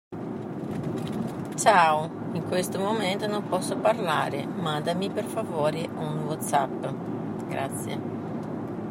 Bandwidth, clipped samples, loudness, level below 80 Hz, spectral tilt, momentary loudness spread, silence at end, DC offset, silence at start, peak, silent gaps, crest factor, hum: 16 kHz; under 0.1%; -27 LUFS; -64 dBFS; -5 dB/octave; 10 LU; 0 s; under 0.1%; 0.1 s; -6 dBFS; none; 22 dB; none